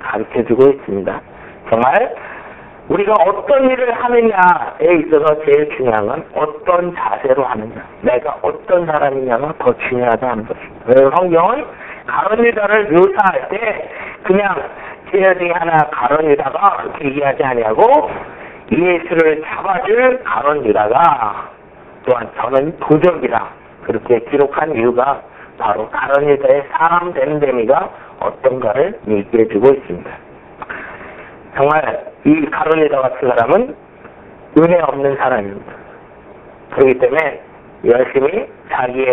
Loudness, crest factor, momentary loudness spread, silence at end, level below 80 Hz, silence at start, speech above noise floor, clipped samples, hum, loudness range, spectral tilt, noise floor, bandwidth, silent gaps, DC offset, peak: -14 LUFS; 14 dB; 16 LU; 0 s; -48 dBFS; 0 s; 26 dB; under 0.1%; none; 4 LU; -9 dB/octave; -39 dBFS; 4 kHz; none; under 0.1%; 0 dBFS